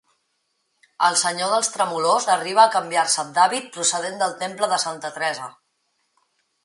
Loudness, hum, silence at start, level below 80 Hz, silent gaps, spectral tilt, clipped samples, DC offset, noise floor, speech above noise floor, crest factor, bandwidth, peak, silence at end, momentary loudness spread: -20 LUFS; none; 1 s; -78 dBFS; none; -1 dB/octave; under 0.1%; under 0.1%; -72 dBFS; 51 dB; 20 dB; 11.5 kHz; -2 dBFS; 1.15 s; 9 LU